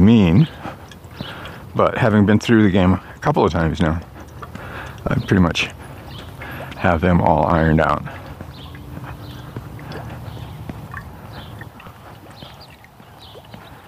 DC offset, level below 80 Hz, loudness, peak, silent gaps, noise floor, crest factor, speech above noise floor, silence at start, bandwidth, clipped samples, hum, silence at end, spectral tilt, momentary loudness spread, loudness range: under 0.1%; -38 dBFS; -17 LUFS; 0 dBFS; none; -43 dBFS; 18 dB; 28 dB; 0 s; 15.5 kHz; under 0.1%; none; 0.15 s; -7.5 dB/octave; 23 LU; 17 LU